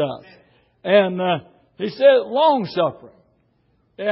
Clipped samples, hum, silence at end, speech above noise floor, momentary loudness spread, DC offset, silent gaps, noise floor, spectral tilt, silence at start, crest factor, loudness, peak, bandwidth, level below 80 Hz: under 0.1%; none; 0 s; 45 dB; 15 LU; under 0.1%; none; -63 dBFS; -10 dB/octave; 0 s; 18 dB; -19 LUFS; -2 dBFS; 5.8 kHz; -68 dBFS